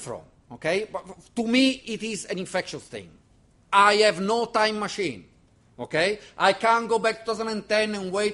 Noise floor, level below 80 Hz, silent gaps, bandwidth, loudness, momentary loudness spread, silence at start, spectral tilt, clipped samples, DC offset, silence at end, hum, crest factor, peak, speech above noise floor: -59 dBFS; -62 dBFS; none; 11.5 kHz; -24 LUFS; 18 LU; 0 s; -3.5 dB/octave; under 0.1%; under 0.1%; 0 s; none; 22 dB; -4 dBFS; 34 dB